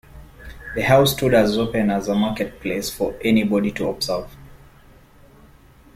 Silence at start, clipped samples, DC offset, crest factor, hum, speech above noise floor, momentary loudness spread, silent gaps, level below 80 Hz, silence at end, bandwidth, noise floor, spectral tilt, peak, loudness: 0.15 s; under 0.1%; under 0.1%; 20 dB; none; 29 dB; 11 LU; none; -44 dBFS; 1.4 s; 16.5 kHz; -49 dBFS; -5.5 dB/octave; -2 dBFS; -20 LUFS